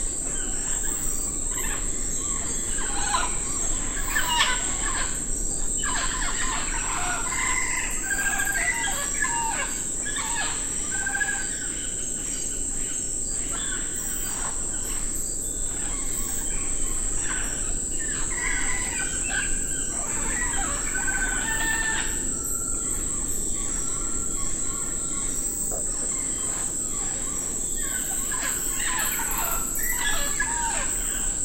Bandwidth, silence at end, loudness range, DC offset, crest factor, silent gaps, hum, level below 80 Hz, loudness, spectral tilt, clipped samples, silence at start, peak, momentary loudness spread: 16 kHz; 0 s; 2 LU; under 0.1%; 20 dB; none; none; -34 dBFS; -25 LUFS; -1 dB/octave; under 0.1%; 0 s; -6 dBFS; 3 LU